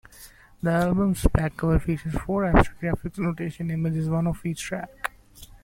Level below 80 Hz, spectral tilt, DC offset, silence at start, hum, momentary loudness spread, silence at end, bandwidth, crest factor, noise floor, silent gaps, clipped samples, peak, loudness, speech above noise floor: -34 dBFS; -7 dB/octave; under 0.1%; 0.2 s; none; 10 LU; 0.2 s; 16.5 kHz; 22 dB; -49 dBFS; none; under 0.1%; -2 dBFS; -26 LUFS; 25 dB